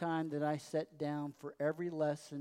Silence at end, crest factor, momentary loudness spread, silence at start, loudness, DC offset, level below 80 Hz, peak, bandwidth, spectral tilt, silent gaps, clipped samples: 0 s; 16 dB; 4 LU; 0 s; -39 LUFS; under 0.1%; -86 dBFS; -22 dBFS; 15 kHz; -7 dB/octave; none; under 0.1%